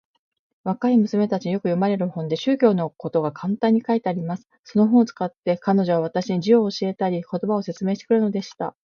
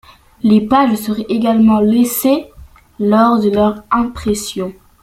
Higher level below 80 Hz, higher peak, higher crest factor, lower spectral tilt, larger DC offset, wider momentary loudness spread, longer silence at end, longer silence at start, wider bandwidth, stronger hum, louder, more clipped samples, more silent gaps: second, -70 dBFS vs -42 dBFS; second, -4 dBFS vs 0 dBFS; about the same, 16 dB vs 14 dB; first, -7.5 dB/octave vs -5.5 dB/octave; neither; about the same, 8 LU vs 8 LU; second, 0.15 s vs 0.3 s; first, 0.65 s vs 0.45 s; second, 7 kHz vs 16.5 kHz; neither; second, -22 LUFS vs -14 LUFS; neither; first, 4.59-4.64 s, 5.38-5.43 s vs none